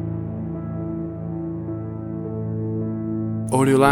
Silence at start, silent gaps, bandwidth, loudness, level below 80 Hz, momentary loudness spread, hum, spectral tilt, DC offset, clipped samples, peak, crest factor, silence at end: 0 s; none; 13.5 kHz; -25 LUFS; -48 dBFS; 10 LU; none; -7 dB/octave; under 0.1%; under 0.1%; -2 dBFS; 22 dB; 0 s